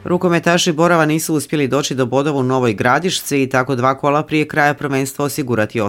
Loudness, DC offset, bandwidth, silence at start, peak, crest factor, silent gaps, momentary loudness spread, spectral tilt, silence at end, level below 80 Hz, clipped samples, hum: -16 LUFS; under 0.1%; 17 kHz; 0.05 s; 0 dBFS; 16 dB; none; 5 LU; -5 dB/octave; 0 s; -54 dBFS; under 0.1%; none